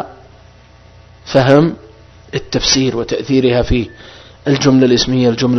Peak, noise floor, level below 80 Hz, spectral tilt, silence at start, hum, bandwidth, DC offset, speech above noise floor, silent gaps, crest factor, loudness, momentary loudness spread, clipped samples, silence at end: 0 dBFS; -42 dBFS; -32 dBFS; -5 dB/octave; 0 s; 60 Hz at -40 dBFS; 6.4 kHz; under 0.1%; 30 dB; none; 14 dB; -13 LUFS; 14 LU; 0.1%; 0 s